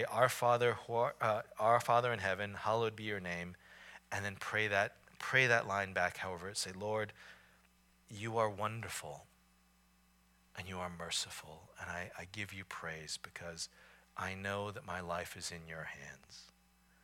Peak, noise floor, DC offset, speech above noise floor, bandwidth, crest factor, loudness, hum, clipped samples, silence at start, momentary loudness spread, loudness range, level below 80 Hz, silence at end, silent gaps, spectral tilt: -16 dBFS; -70 dBFS; under 0.1%; 32 dB; 17 kHz; 24 dB; -37 LUFS; none; under 0.1%; 0 s; 19 LU; 9 LU; -70 dBFS; 0.55 s; none; -3.5 dB/octave